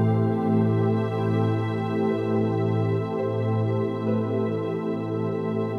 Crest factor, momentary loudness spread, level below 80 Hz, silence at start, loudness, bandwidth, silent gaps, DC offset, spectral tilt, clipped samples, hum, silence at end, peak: 14 dB; 5 LU; -66 dBFS; 0 s; -25 LUFS; 4.9 kHz; none; under 0.1%; -10 dB/octave; under 0.1%; none; 0 s; -10 dBFS